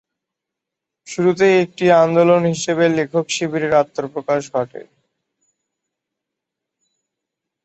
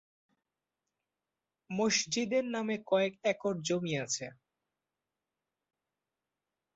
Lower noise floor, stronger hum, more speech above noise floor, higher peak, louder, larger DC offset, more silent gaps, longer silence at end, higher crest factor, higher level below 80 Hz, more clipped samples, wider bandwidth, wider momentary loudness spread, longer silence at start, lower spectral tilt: second, -83 dBFS vs -90 dBFS; neither; first, 67 dB vs 57 dB; first, -2 dBFS vs -16 dBFS; first, -17 LUFS vs -32 LUFS; neither; neither; first, 2.8 s vs 2.45 s; about the same, 18 dB vs 22 dB; first, -62 dBFS vs -78 dBFS; neither; about the same, 8.2 kHz vs 8 kHz; first, 11 LU vs 7 LU; second, 1.1 s vs 1.7 s; first, -5.5 dB/octave vs -3.5 dB/octave